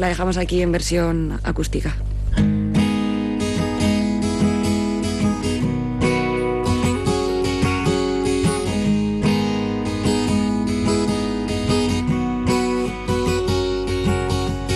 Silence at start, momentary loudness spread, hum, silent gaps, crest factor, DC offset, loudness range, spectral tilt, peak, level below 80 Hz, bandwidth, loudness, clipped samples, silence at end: 0 s; 4 LU; none; none; 12 dB; under 0.1%; 1 LU; -6 dB/octave; -8 dBFS; -30 dBFS; 12.5 kHz; -20 LUFS; under 0.1%; 0 s